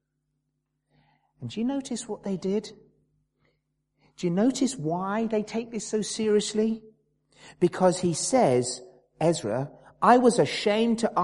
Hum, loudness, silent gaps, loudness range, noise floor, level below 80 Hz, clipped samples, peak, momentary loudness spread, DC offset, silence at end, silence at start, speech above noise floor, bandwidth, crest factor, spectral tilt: none; -26 LUFS; none; 10 LU; -79 dBFS; -66 dBFS; under 0.1%; -4 dBFS; 11 LU; under 0.1%; 0 s; 1.4 s; 54 dB; 11.5 kHz; 22 dB; -5 dB/octave